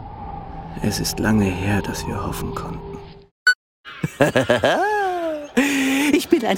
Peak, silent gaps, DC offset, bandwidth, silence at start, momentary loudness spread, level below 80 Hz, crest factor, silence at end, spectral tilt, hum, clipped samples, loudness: 0 dBFS; 3.31-3.46 s, 3.55-3.84 s; under 0.1%; 17 kHz; 0 s; 16 LU; -40 dBFS; 20 dB; 0 s; -4.5 dB/octave; none; under 0.1%; -20 LUFS